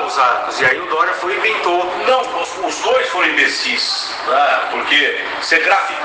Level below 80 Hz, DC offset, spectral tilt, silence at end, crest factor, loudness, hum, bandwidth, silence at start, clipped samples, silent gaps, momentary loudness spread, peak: -58 dBFS; under 0.1%; -1 dB/octave; 0 s; 16 dB; -15 LUFS; none; 10 kHz; 0 s; under 0.1%; none; 6 LU; 0 dBFS